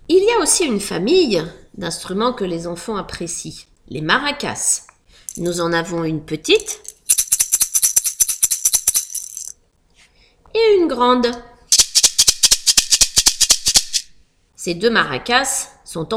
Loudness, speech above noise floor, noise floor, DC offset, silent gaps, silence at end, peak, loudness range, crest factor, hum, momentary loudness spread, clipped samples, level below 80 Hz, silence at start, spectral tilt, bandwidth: -15 LUFS; 37 dB; -55 dBFS; under 0.1%; none; 0 s; 0 dBFS; 9 LU; 18 dB; none; 16 LU; under 0.1%; -44 dBFS; 0.1 s; -1.5 dB/octave; over 20 kHz